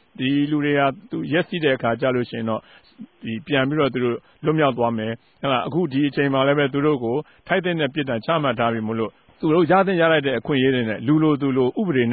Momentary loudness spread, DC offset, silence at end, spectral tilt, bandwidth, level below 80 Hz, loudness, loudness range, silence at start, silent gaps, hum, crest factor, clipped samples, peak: 9 LU; under 0.1%; 0 s; -11.5 dB/octave; 4.7 kHz; -58 dBFS; -21 LUFS; 4 LU; 0.2 s; none; none; 16 dB; under 0.1%; -6 dBFS